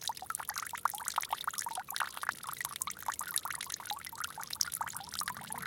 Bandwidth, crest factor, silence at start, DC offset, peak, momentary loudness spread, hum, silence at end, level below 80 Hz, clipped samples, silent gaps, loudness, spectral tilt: 17 kHz; 28 dB; 0 s; under 0.1%; -10 dBFS; 5 LU; none; 0 s; -72 dBFS; under 0.1%; none; -37 LUFS; 0.5 dB/octave